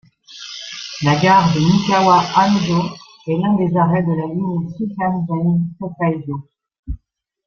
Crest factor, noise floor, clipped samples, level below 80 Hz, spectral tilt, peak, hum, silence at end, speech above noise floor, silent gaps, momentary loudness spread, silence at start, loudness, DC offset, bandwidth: 16 dB; -60 dBFS; under 0.1%; -42 dBFS; -6.5 dB/octave; -2 dBFS; none; 0.5 s; 45 dB; 6.79-6.83 s; 18 LU; 0.3 s; -17 LUFS; under 0.1%; 7 kHz